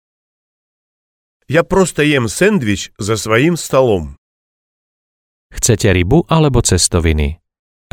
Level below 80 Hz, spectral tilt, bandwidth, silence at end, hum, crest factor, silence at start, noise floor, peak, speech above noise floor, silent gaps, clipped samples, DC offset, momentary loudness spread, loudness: -28 dBFS; -4.5 dB/octave; 17.5 kHz; 0.6 s; none; 16 dB; 1.5 s; under -90 dBFS; 0 dBFS; over 77 dB; 4.18-5.50 s; under 0.1%; under 0.1%; 8 LU; -14 LUFS